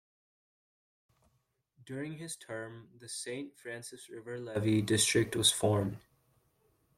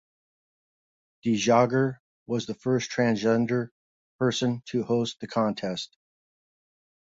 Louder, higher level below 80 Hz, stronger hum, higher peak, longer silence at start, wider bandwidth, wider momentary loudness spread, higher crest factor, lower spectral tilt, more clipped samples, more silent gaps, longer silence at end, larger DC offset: second, -32 LUFS vs -26 LUFS; about the same, -68 dBFS vs -66 dBFS; neither; second, -12 dBFS vs -6 dBFS; first, 1.85 s vs 1.25 s; first, 16 kHz vs 7.8 kHz; first, 19 LU vs 11 LU; about the same, 22 dB vs 22 dB; second, -3.5 dB/octave vs -5.5 dB/octave; neither; second, none vs 2.00-2.26 s, 3.71-4.19 s; second, 1 s vs 1.35 s; neither